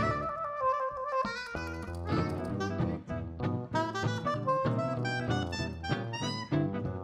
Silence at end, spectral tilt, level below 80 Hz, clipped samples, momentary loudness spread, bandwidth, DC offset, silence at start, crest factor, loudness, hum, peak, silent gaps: 0 s; -6.5 dB/octave; -54 dBFS; under 0.1%; 6 LU; 12.5 kHz; under 0.1%; 0 s; 16 dB; -33 LUFS; none; -16 dBFS; none